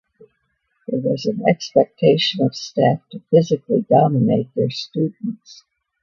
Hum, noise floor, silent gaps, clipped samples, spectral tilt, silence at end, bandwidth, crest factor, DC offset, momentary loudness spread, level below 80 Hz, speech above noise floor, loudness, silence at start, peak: none; -69 dBFS; none; under 0.1%; -6.5 dB/octave; 0.5 s; 7.2 kHz; 18 dB; under 0.1%; 11 LU; -62 dBFS; 51 dB; -19 LUFS; 0.9 s; 0 dBFS